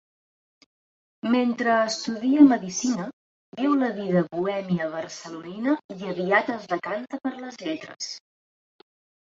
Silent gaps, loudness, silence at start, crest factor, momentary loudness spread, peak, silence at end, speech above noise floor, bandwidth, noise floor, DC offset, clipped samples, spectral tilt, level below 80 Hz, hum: 3.13-3.52 s, 5.84-5.89 s; -25 LUFS; 1.25 s; 22 dB; 14 LU; -4 dBFS; 1.1 s; over 66 dB; 8 kHz; under -90 dBFS; under 0.1%; under 0.1%; -5 dB/octave; -72 dBFS; none